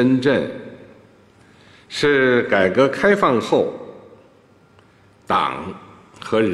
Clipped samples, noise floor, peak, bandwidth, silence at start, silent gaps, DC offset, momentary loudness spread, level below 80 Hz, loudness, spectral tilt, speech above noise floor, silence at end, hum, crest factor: under 0.1%; -52 dBFS; -2 dBFS; 12 kHz; 0 s; none; under 0.1%; 20 LU; -58 dBFS; -18 LUFS; -6 dB/octave; 35 dB; 0 s; none; 18 dB